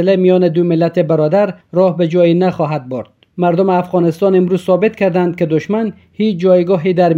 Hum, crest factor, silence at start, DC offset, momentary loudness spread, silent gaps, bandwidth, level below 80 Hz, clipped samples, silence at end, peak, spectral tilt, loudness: none; 12 dB; 0 s; under 0.1%; 7 LU; none; 7.4 kHz; -58 dBFS; under 0.1%; 0 s; 0 dBFS; -9 dB/octave; -13 LUFS